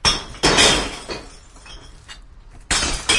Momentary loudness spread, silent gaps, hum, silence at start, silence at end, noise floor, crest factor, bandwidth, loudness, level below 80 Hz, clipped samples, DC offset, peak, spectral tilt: 19 LU; none; none; 0.05 s; 0 s; -42 dBFS; 20 dB; 11.5 kHz; -16 LUFS; -34 dBFS; under 0.1%; under 0.1%; -2 dBFS; -1.5 dB/octave